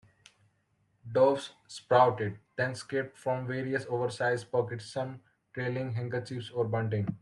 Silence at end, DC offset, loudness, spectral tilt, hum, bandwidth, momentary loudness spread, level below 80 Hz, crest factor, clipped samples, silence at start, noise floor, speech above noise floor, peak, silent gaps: 0.05 s; under 0.1%; -31 LUFS; -6.5 dB/octave; none; 11.5 kHz; 11 LU; -72 dBFS; 20 dB; under 0.1%; 1.05 s; -73 dBFS; 43 dB; -10 dBFS; none